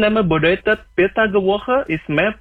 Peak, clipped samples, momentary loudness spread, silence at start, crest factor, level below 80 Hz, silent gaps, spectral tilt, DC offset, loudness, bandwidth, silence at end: -4 dBFS; under 0.1%; 4 LU; 0 s; 12 dB; -42 dBFS; none; -8 dB/octave; under 0.1%; -17 LUFS; 4.7 kHz; 0.05 s